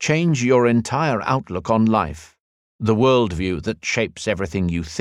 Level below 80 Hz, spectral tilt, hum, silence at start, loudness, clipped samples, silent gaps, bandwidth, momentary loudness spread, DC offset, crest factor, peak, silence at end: -44 dBFS; -6 dB/octave; none; 0 s; -20 LUFS; under 0.1%; 2.40-2.79 s; 11 kHz; 8 LU; under 0.1%; 16 dB; -4 dBFS; 0 s